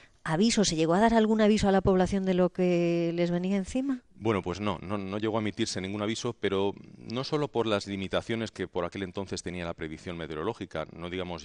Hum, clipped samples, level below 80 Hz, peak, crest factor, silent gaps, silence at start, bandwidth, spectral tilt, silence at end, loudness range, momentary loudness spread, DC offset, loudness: none; under 0.1%; -50 dBFS; -8 dBFS; 20 dB; none; 0.25 s; 10.5 kHz; -5.5 dB/octave; 0 s; 8 LU; 13 LU; under 0.1%; -29 LUFS